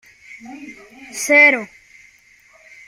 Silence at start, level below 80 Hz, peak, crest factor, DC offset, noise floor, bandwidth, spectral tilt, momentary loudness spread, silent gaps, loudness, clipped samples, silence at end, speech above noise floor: 0.35 s; -66 dBFS; -2 dBFS; 20 dB; under 0.1%; -51 dBFS; 16 kHz; -1.5 dB/octave; 27 LU; none; -13 LUFS; under 0.1%; 1.2 s; 34 dB